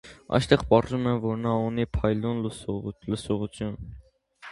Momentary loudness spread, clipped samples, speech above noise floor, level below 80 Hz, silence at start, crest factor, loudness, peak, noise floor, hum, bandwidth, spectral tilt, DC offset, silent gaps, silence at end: 12 LU; under 0.1%; 24 dB; -44 dBFS; 0.05 s; 24 dB; -27 LUFS; -2 dBFS; -50 dBFS; none; 11.5 kHz; -7 dB/octave; under 0.1%; none; 0 s